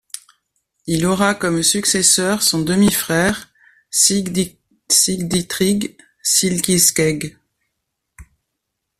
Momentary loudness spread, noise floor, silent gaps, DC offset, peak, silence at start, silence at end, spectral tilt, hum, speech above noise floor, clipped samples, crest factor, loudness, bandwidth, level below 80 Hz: 13 LU; -77 dBFS; none; under 0.1%; 0 dBFS; 0.15 s; 0.75 s; -3 dB/octave; none; 60 dB; under 0.1%; 18 dB; -16 LUFS; 16 kHz; -48 dBFS